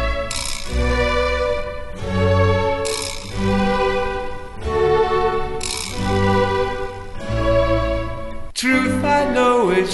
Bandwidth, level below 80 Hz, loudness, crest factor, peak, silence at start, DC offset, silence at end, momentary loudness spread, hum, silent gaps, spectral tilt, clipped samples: 12 kHz; -28 dBFS; -19 LUFS; 14 dB; -4 dBFS; 0 s; under 0.1%; 0 s; 11 LU; none; none; -5 dB/octave; under 0.1%